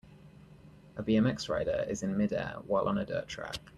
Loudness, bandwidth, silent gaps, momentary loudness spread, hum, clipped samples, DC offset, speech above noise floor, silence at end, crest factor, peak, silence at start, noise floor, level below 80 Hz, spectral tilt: -32 LUFS; 12 kHz; none; 11 LU; none; under 0.1%; under 0.1%; 23 dB; 0.1 s; 16 dB; -16 dBFS; 0.05 s; -55 dBFS; -56 dBFS; -6 dB/octave